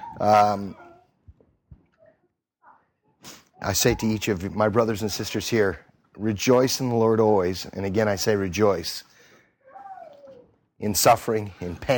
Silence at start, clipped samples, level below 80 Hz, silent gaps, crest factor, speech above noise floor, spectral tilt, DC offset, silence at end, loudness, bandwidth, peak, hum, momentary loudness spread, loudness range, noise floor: 0 s; under 0.1%; -50 dBFS; none; 20 dB; 49 dB; -4.5 dB/octave; under 0.1%; 0 s; -23 LUFS; 19 kHz; -4 dBFS; none; 17 LU; 6 LU; -71 dBFS